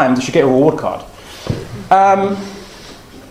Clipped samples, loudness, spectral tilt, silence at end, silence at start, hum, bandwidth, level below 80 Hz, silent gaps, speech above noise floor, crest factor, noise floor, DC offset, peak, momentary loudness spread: under 0.1%; -14 LUFS; -6 dB/octave; 0.05 s; 0 s; none; 15.5 kHz; -44 dBFS; none; 23 dB; 16 dB; -36 dBFS; under 0.1%; 0 dBFS; 23 LU